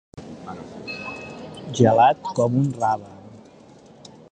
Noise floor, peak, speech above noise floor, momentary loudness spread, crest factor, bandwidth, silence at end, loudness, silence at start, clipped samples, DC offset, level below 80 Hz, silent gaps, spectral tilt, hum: -48 dBFS; -2 dBFS; 29 dB; 21 LU; 20 dB; 9.4 kHz; 0.95 s; -21 LUFS; 0.15 s; under 0.1%; under 0.1%; -58 dBFS; none; -6.5 dB/octave; none